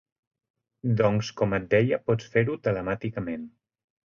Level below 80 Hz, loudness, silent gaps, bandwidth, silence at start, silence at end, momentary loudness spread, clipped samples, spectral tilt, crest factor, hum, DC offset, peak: -54 dBFS; -26 LUFS; none; 7.2 kHz; 0.85 s; 0.6 s; 11 LU; under 0.1%; -7.5 dB/octave; 18 dB; none; under 0.1%; -8 dBFS